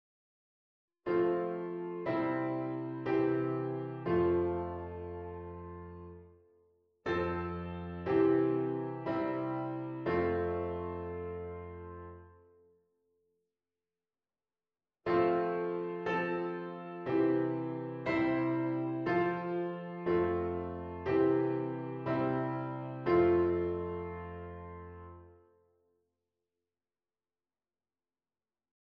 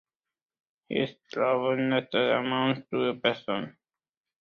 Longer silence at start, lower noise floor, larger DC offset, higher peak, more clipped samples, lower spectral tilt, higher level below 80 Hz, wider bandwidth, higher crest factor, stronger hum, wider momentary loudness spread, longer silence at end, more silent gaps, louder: first, 1.05 s vs 0.9 s; about the same, under -90 dBFS vs under -90 dBFS; neither; second, -18 dBFS vs -8 dBFS; neither; first, -9.5 dB/octave vs -7 dB/octave; first, -60 dBFS vs -70 dBFS; second, 5.4 kHz vs 6.8 kHz; about the same, 18 dB vs 22 dB; neither; first, 15 LU vs 8 LU; first, 3.55 s vs 0.7 s; neither; second, -34 LUFS vs -28 LUFS